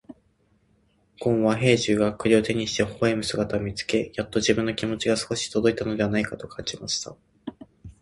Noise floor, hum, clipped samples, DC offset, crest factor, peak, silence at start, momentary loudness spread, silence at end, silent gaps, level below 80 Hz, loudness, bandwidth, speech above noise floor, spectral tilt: -65 dBFS; none; under 0.1%; under 0.1%; 22 dB; -4 dBFS; 0.1 s; 11 LU; 0.1 s; none; -52 dBFS; -24 LUFS; 11.5 kHz; 41 dB; -4.5 dB/octave